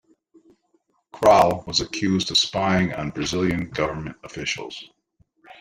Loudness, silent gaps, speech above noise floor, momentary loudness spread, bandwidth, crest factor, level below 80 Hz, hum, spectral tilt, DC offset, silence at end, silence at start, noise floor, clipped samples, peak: -21 LUFS; none; 46 dB; 14 LU; 16 kHz; 20 dB; -50 dBFS; none; -4 dB/octave; under 0.1%; 0.1 s; 1.15 s; -67 dBFS; under 0.1%; -2 dBFS